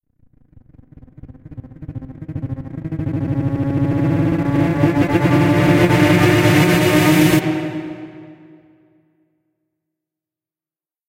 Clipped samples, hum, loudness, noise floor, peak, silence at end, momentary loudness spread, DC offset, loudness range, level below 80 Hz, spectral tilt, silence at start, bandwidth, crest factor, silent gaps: under 0.1%; none; -16 LUFS; under -90 dBFS; -2 dBFS; 2.75 s; 20 LU; under 0.1%; 14 LU; -42 dBFS; -6.5 dB/octave; 1.25 s; 16 kHz; 16 dB; none